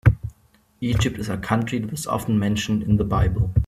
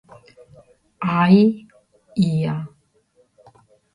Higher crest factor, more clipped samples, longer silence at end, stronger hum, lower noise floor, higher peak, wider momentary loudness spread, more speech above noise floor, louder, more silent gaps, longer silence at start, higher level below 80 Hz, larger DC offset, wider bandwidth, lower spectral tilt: about the same, 20 dB vs 18 dB; neither; second, 0 s vs 1.25 s; neither; about the same, -59 dBFS vs -61 dBFS; about the same, -2 dBFS vs -2 dBFS; second, 8 LU vs 18 LU; second, 38 dB vs 44 dB; second, -23 LUFS vs -19 LUFS; neither; second, 0.05 s vs 1 s; first, -32 dBFS vs -60 dBFS; neither; first, 14.5 kHz vs 10 kHz; second, -6.5 dB/octave vs -8.5 dB/octave